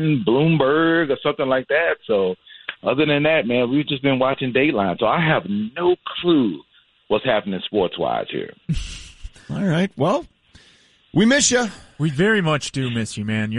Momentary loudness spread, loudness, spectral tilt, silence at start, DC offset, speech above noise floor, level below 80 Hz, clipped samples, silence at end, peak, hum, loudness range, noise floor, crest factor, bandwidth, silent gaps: 11 LU; -20 LUFS; -5 dB/octave; 0 s; under 0.1%; 35 dB; -44 dBFS; under 0.1%; 0 s; -4 dBFS; none; 5 LU; -54 dBFS; 16 dB; 11.5 kHz; none